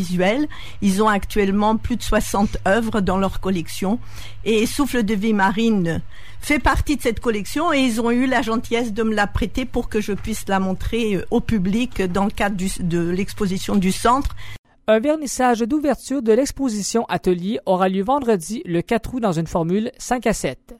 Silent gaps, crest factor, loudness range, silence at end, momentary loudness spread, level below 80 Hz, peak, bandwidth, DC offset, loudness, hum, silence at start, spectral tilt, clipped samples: 14.59-14.64 s; 16 dB; 2 LU; 0 s; 6 LU; -34 dBFS; -4 dBFS; 16 kHz; under 0.1%; -20 LUFS; none; 0 s; -5.5 dB/octave; under 0.1%